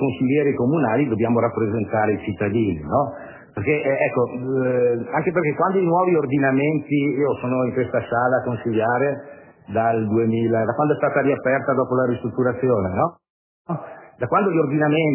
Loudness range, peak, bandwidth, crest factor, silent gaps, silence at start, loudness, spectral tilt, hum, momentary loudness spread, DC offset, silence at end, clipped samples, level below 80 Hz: 2 LU; -6 dBFS; 3.2 kHz; 14 dB; 13.30-13.65 s; 0 s; -21 LUFS; -11.5 dB/octave; none; 5 LU; under 0.1%; 0 s; under 0.1%; -50 dBFS